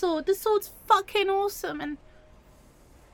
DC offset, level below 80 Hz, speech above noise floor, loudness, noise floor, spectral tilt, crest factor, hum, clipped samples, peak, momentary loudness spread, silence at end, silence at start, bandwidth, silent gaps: under 0.1%; -56 dBFS; 28 dB; -26 LUFS; -55 dBFS; -3 dB/octave; 22 dB; none; under 0.1%; -6 dBFS; 12 LU; 1.2 s; 0 s; 17.5 kHz; none